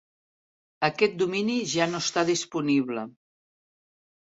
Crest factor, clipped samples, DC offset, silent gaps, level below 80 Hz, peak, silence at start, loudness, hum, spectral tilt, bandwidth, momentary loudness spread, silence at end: 22 dB; under 0.1%; under 0.1%; none; -70 dBFS; -6 dBFS; 0.8 s; -26 LUFS; none; -4 dB/octave; 8 kHz; 6 LU; 1.15 s